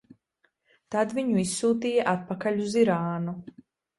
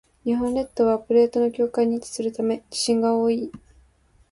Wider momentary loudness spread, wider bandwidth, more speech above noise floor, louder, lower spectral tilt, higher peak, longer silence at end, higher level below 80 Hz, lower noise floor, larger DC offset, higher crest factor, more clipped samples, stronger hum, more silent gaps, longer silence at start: about the same, 9 LU vs 7 LU; about the same, 11.5 kHz vs 11.5 kHz; first, 47 dB vs 37 dB; second, -26 LUFS vs -23 LUFS; about the same, -5.5 dB/octave vs -4.5 dB/octave; about the same, -10 dBFS vs -8 dBFS; second, 0.5 s vs 0.75 s; second, -66 dBFS vs -56 dBFS; first, -72 dBFS vs -59 dBFS; neither; about the same, 18 dB vs 16 dB; neither; neither; neither; first, 0.9 s vs 0.25 s